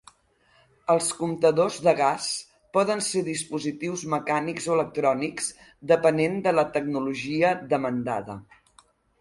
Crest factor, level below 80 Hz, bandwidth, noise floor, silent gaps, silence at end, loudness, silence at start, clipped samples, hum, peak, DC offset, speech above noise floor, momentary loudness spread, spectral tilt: 20 dB; -64 dBFS; 11.5 kHz; -63 dBFS; none; 0.8 s; -25 LUFS; 0.9 s; under 0.1%; none; -6 dBFS; under 0.1%; 38 dB; 10 LU; -4.5 dB/octave